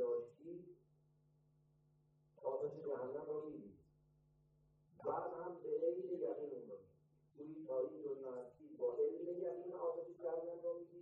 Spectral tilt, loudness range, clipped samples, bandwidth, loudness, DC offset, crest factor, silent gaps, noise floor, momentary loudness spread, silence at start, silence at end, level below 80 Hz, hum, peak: -9 dB/octave; 5 LU; under 0.1%; 3 kHz; -45 LUFS; under 0.1%; 18 dB; none; -75 dBFS; 14 LU; 0 s; 0 s; -86 dBFS; none; -28 dBFS